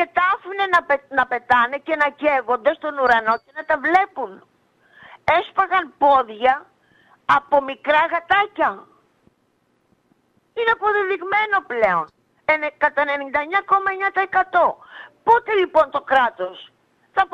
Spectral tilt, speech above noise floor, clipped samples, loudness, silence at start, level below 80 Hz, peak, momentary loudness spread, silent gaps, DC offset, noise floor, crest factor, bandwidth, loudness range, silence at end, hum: -4.5 dB/octave; 46 dB; under 0.1%; -19 LUFS; 0 s; -58 dBFS; -4 dBFS; 8 LU; none; under 0.1%; -65 dBFS; 16 dB; 9.6 kHz; 3 LU; 0.1 s; none